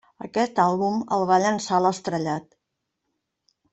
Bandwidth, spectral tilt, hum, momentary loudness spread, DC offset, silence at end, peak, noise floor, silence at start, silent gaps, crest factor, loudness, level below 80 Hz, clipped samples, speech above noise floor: 8.4 kHz; -5.5 dB/octave; none; 8 LU; under 0.1%; 1.3 s; -6 dBFS; -80 dBFS; 0.2 s; none; 18 dB; -23 LUFS; -66 dBFS; under 0.1%; 58 dB